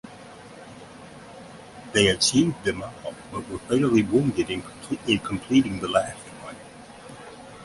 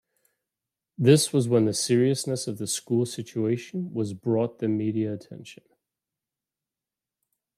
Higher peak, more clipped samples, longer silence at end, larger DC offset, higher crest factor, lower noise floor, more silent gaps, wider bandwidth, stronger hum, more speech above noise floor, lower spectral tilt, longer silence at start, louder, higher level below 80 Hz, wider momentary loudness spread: about the same, -4 dBFS vs -4 dBFS; neither; second, 0 s vs 2.05 s; neither; about the same, 22 dB vs 22 dB; second, -44 dBFS vs -90 dBFS; neither; second, 11.5 kHz vs 15 kHz; neither; second, 21 dB vs 65 dB; about the same, -4.5 dB/octave vs -5.5 dB/octave; second, 0.05 s vs 1 s; about the same, -23 LUFS vs -25 LUFS; first, -52 dBFS vs -72 dBFS; first, 23 LU vs 11 LU